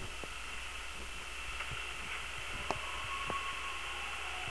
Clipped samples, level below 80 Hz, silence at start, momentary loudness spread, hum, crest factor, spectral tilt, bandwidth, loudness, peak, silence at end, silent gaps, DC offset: under 0.1%; -52 dBFS; 0 s; 5 LU; none; 24 dB; -2 dB/octave; 11 kHz; -40 LUFS; -18 dBFS; 0 s; none; 0.4%